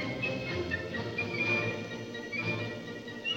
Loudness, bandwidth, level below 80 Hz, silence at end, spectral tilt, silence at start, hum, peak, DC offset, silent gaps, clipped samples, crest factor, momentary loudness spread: -33 LUFS; 16 kHz; -60 dBFS; 0 s; -5 dB/octave; 0 s; none; -18 dBFS; under 0.1%; none; under 0.1%; 16 dB; 10 LU